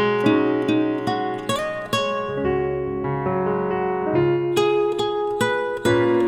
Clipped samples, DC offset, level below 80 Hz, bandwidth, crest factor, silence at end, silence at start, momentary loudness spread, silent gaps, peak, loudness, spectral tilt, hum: under 0.1%; under 0.1%; -48 dBFS; 14.5 kHz; 16 dB; 0 s; 0 s; 6 LU; none; -6 dBFS; -22 LUFS; -6 dB/octave; none